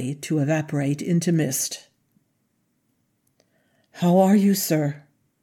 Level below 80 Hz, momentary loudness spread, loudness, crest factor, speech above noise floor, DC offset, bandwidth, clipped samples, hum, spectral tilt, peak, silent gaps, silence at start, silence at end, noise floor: -76 dBFS; 11 LU; -22 LUFS; 18 dB; 49 dB; under 0.1%; 17 kHz; under 0.1%; none; -5.5 dB/octave; -6 dBFS; none; 0 s; 0.45 s; -70 dBFS